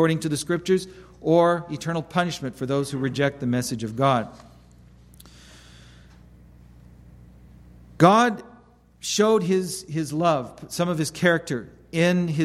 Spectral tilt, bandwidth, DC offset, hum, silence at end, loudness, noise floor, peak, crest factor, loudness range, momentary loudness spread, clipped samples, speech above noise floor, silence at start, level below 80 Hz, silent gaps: -5.5 dB/octave; 14.5 kHz; under 0.1%; 60 Hz at -50 dBFS; 0 s; -23 LUFS; -53 dBFS; -2 dBFS; 22 dB; 6 LU; 12 LU; under 0.1%; 30 dB; 0 s; -54 dBFS; none